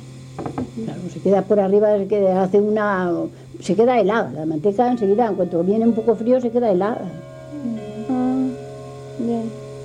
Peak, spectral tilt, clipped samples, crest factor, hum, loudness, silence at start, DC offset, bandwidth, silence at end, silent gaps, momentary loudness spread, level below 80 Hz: -6 dBFS; -8 dB/octave; under 0.1%; 14 dB; none; -19 LUFS; 0 s; under 0.1%; 10 kHz; 0 s; none; 14 LU; -56 dBFS